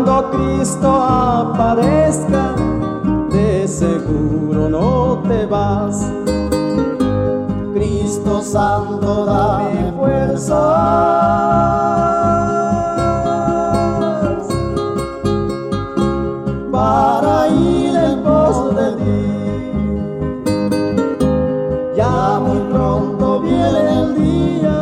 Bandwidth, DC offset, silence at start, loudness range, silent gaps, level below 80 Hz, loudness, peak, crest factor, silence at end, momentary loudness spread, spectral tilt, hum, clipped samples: 14 kHz; under 0.1%; 0 s; 3 LU; none; -32 dBFS; -16 LUFS; -2 dBFS; 12 dB; 0 s; 6 LU; -7 dB/octave; none; under 0.1%